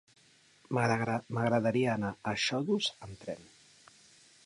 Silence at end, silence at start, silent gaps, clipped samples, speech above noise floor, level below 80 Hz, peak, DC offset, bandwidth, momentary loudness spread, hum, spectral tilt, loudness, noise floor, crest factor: 1 s; 0.7 s; none; under 0.1%; 32 dB; -66 dBFS; -16 dBFS; under 0.1%; 11 kHz; 14 LU; none; -5.5 dB/octave; -31 LUFS; -63 dBFS; 18 dB